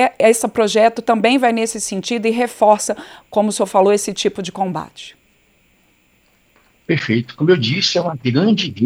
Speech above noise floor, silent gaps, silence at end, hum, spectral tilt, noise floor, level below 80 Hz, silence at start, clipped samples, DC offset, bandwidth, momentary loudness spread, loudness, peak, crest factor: 41 dB; none; 0 s; none; -4.5 dB/octave; -57 dBFS; -60 dBFS; 0 s; under 0.1%; under 0.1%; 16 kHz; 9 LU; -16 LUFS; 0 dBFS; 16 dB